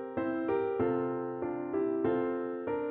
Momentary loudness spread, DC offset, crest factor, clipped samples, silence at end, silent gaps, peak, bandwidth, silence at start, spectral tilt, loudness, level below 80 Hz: 5 LU; under 0.1%; 14 dB; under 0.1%; 0 s; none; -18 dBFS; 4 kHz; 0 s; -11 dB/octave; -33 LUFS; -66 dBFS